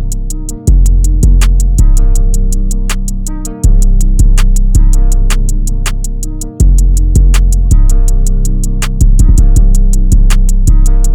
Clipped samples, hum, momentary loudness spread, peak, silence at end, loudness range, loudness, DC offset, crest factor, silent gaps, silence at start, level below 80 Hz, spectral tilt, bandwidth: 0.1%; none; 8 LU; 0 dBFS; 0 s; 2 LU; -12 LUFS; under 0.1%; 6 dB; none; 0 s; -6 dBFS; -5.5 dB/octave; 14 kHz